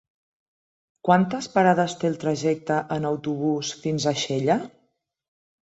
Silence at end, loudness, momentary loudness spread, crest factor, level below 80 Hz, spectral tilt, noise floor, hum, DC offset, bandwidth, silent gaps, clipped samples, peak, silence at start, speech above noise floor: 0.95 s; -24 LUFS; 7 LU; 20 dB; -64 dBFS; -5.5 dB/octave; -71 dBFS; none; under 0.1%; 8.2 kHz; none; under 0.1%; -4 dBFS; 1.05 s; 48 dB